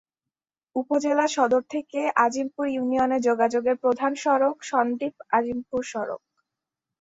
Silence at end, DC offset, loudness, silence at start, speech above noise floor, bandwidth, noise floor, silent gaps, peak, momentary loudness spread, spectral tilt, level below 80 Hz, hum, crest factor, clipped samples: 0.85 s; under 0.1%; -24 LUFS; 0.75 s; 66 dB; 8 kHz; -89 dBFS; none; -6 dBFS; 9 LU; -4 dB/octave; -68 dBFS; none; 20 dB; under 0.1%